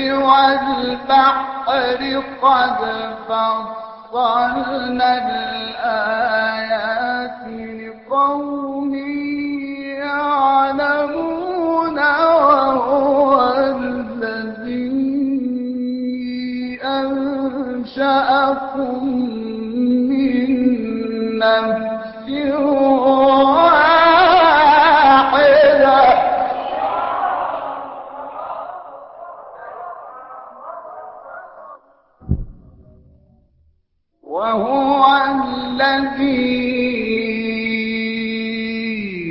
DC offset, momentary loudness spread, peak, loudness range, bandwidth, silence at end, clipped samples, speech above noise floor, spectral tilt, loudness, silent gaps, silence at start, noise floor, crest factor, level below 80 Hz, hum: under 0.1%; 19 LU; 0 dBFS; 20 LU; 5.8 kHz; 0 s; under 0.1%; 48 dB; -9.5 dB/octave; -16 LUFS; none; 0 s; -64 dBFS; 16 dB; -44 dBFS; none